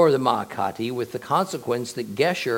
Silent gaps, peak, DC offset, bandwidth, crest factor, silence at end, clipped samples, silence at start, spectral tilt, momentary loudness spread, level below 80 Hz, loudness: none; -4 dBFS; under 0.1%; 17 kHz; 18 dB; 0 s; under 0.1%; 0 s; -5 dB/octave; 6 LU; -68 dBFS; -25 LUFS